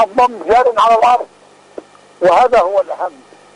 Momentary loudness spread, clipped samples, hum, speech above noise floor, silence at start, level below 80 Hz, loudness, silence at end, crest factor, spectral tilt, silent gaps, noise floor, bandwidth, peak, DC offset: 13 LU; under 0.1%; 50 Hz at -60 dBFS; 24 dB; 0 s; -48 dBFS; -12 LUFS; 0.45 s; 10 dB; -4 dB/octave; none; -35 dBFS; 11 kHz; -4 dBFS; under 0.1%